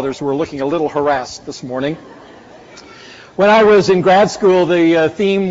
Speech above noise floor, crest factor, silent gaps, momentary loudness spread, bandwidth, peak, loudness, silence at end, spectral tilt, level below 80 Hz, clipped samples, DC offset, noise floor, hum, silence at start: 26 dB; 12 dB; none; 15 LU; 8 kHz; -2 dBFS; -13 LUFS; 0 s; -4.5 dB/octave; -50 dBFS; under 0.1%; under 0.1%; -39 dBFS; none; 0 s